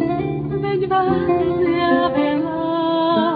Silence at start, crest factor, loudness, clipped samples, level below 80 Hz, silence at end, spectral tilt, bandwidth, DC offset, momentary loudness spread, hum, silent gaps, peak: 0 s; 14 dB; -19 LUFS; under 0.1%; -46 dBFS; 0 s; -10 dB/octave; 4.9 kHz; under 0.1%; 5 LU; none; none; -4 dBFS